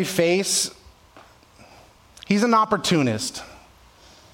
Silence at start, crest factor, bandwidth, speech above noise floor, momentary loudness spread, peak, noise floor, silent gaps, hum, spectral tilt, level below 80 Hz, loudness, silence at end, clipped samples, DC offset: 0 s; 20 dB; 17 kHz; 30 dB; 11 LU; -4 dBFS; -51 dBFS; none; none; -4 dB/octave; -58 dBFS; -21 LUFS; 0.75 s; under 0.1%; under 0.1%